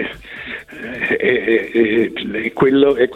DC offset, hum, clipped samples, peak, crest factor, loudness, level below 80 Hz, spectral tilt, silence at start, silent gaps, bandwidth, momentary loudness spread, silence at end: under 0.1%; none; under 0.1%; -2 dBFS; 14 dB; -16 LUFS; -48 dBFS; -7 dB/octave; 0 s; none; 9.2 kHz; 16 LU; 0 s